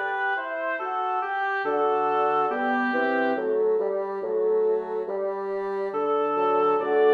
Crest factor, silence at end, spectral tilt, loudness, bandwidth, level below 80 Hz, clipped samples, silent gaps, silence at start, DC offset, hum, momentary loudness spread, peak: 14 dB; 0 s; -6.5 dB/octave; -25 LUFS; 5 kHz; -70 dBFS; under 0.1%; none; 0 s; under 0.1%; none; 6 LU; -10 dBFS